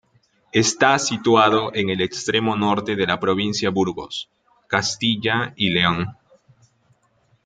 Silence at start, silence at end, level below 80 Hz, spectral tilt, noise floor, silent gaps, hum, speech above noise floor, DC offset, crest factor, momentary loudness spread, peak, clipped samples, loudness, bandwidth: 0.55 s; 1.35 s; -58 dBFS; -4 dB/octave; -62 dBFS; none; none; 42 dB; under 0.1%; 20 dB; 9 LU; -2 dBFS; under 0.1%; -20 LUFS; 9.6 kHz